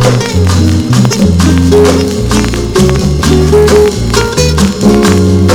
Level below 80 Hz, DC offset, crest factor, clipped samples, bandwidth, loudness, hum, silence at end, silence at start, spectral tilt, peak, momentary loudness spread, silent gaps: -18 dBFS; under 0.1%; 6 dB; 2%; 17.5 kHz; -8 LUFS; none; 0 s; 0 s; -5.5 dB/octave; 0 dBFS; 4 LU; none